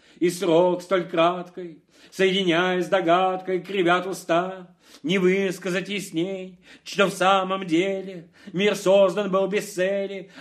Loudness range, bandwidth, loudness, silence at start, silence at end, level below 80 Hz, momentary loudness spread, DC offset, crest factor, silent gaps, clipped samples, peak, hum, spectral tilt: 3 LU; 15 kHz; -23 LUFS; 0.2 s; 0 s; -76 dBFS; 15 LU; under 0.1%; 18 dB; none; under 0.1%; -4 dBFS; none; -5 dB/octave